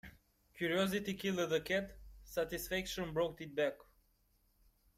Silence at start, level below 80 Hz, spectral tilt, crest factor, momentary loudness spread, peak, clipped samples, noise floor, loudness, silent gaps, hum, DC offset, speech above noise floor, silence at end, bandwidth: 0.05 s; -60 dBFS; -4.5 dB/octave; 18 dB; 6 LU; -22 dBFS; under 0.1%; -75 dBFS; -38 LUFS; none; none; under 0.1%; 37 dB; 1.2 s; 16 kHz